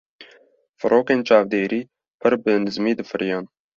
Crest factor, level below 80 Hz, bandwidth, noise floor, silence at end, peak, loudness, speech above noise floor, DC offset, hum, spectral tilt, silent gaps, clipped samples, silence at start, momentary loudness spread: 18 dB; -64 dBFS; 7.2 kHz; -55 dBFS; 0.3 s; -2 dBFS; -21 LUFS; 36 dB; under 0.1%; none; -6.5 dB/octave; 0.69-0.74 s, 2.10-2.19 s; under 0.1%; 0.2 s; 9 LU